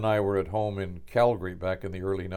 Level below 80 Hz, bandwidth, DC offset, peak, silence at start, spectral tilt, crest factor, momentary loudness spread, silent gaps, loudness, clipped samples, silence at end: -50 dBFS; 16.5 kHz; under 0.1%; -10 dBFS; 0 s; -8 dB/octave; 16 dB; 8 LU; none; -28 LUFS; under 0.1%; 0 s